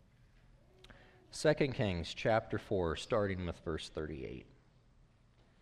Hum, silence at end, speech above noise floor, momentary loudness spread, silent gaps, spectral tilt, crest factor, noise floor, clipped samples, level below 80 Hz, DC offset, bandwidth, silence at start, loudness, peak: none; 1.2 s; 31 dB; 12 LU; none; -5.5 dB/octave; 20 dB; -67 dBFS; under 0.1%; -56 dBFS; under 0.1%; 12.5 kHz; 0.85 s; -36 LUFS; -18 dBFS